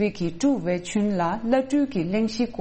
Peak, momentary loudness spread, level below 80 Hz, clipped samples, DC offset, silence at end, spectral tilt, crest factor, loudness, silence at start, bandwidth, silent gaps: -8 dBFS; 3 LU; -50 dBFS; under 0.1%; under 0.1%; 0 s; -6 dB/octave; 16 dB; -24 LUFS; 0 s; 8.6 kHz; none